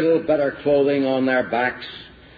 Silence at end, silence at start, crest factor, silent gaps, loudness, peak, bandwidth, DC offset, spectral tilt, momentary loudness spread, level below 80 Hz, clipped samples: 0.3 s; 0 s; 12 dB; none; -20 LUFS; -8 dBFS; 5 kHz; under 0.1%; -8.5 dB/octave; 15 LU; -56 dBFS; under 0.1%